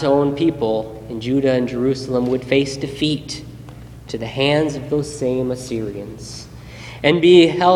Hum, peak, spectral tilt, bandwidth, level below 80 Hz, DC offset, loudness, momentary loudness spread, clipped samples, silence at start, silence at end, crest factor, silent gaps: none; 0 dBFS; -6 dB/octave; 12 kHz; -44 dBFS; under 0.1%; -18 LUFS; 20 LU; under 0.1%; 0 s; 0 s; 18 dB; none